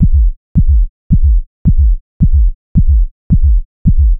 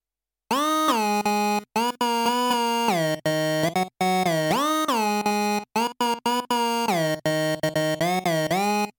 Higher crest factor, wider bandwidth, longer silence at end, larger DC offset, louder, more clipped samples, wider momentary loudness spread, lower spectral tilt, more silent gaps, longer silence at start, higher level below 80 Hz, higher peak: about the same, 10 dB vs 14 dB; second, 0.7 kHz vs 19 kHz; about the same, 0 s vs 0.1 s; neither; first, -14 LUFS vs -23 LUFS; neither; about the same, 3 LU vs 3 LU; first, -15.5 dB/octave vs -4 dB/octave; first, 0.37-0.55 s, 0.89-1.10 s, 1.47-1.65 s, 2.01-2.20 s, 2.55-2.75 s, 3.11-3.30 s, 3.65-3.85 s vs none; second, 0 s vs 0.5 s; first, -10 dBFS vs -66 dBFS; first, 0 dBFS vs -8 dBFS